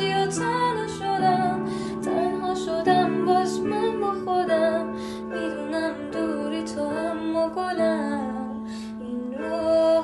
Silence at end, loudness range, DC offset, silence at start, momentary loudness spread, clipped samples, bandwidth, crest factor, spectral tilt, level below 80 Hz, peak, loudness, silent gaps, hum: 0 s; 4 LU; under 0.1%; 0 s; 10 LU; under 0.1%; 12 kHz; 16 dB; -5.5 dB/octave; -56 dBFS; -10 dBFS; -25 LUFS; none; none